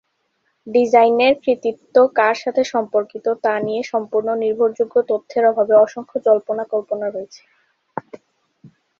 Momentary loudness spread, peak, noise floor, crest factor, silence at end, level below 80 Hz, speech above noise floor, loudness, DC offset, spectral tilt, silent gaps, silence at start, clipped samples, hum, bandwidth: 11 LU; -2 dBFS; -68 dBFS; 16 dB; 0.35 s; -66 dBFS; 51 dB; -18 LUFS; under 0.1%; -5 dB/octave; none; 0.65 s; under 0.1%; none; 7.4 kHz